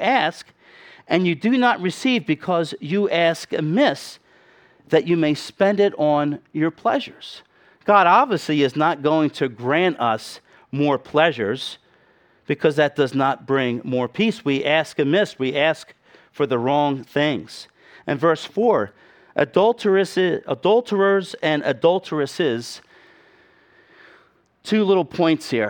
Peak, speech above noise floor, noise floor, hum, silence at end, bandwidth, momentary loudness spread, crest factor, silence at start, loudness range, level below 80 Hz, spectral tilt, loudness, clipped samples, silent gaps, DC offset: -2 dBFS; 38 dB; -57 dBFS; none; 0 s; 17.5 kHz; 10 LU; 20 dB; 0 s; 3 LU; -66 dBFS; -6 dB/octave; -20 LUFS; under 0.1%; none; under 0.1%